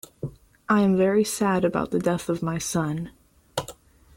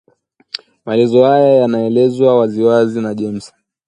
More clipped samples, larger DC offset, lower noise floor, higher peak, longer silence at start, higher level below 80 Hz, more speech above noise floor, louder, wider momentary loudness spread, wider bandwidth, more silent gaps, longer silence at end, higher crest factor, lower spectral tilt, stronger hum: neither; neither; second, -47 dBFS vs -54 dBFS; second, -8 dBFS vs 0 dBFS; second, 0.25 s vs 0.85 s; first, -54 dBFS vs -60 dBFS; second, 24 dB vs 42 dB; second, -24 LUFS vs -13 LUFS; about the same, 17 LU vs 18 LU; first, 17 kHz vs 10 kHz; neither; about the same, 0.45 s vs 0.4 s; about the same, 16 dB vs 14 dB; second, -5.5 dB/octave vs -7.5 dB/octave; neither